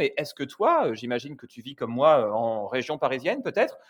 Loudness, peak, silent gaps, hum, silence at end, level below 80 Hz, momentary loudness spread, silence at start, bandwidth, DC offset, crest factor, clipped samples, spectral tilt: -25 LUFS; -8 dBFS; none; none; 0.1 s; -74 dBFS; 14 LU; 0 s; 18.5 kHz; under 0.1%; 18 dB; under 0.1%; -5.5 dB/octave